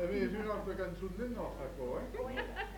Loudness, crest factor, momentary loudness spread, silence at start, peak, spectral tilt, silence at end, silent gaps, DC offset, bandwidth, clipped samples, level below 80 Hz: -40 LUFS; 16 dB; 5 LU; 0 s; -22 dBFS; -6.5 dB/octave; 0 s; none; under 0.1%; 19 kHz; under 0.1%; -50 dBFS